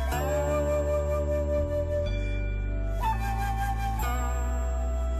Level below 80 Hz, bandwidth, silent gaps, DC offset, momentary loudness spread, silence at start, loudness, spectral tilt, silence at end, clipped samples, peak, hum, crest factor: -30 dBFS; 14.5 kHz; none; under 0.1%; 5 LU; 0 s; -29 LUFS; -6.5 dB/octave; 0 s; under 0.1%; -18 dBFS; none; 10 dB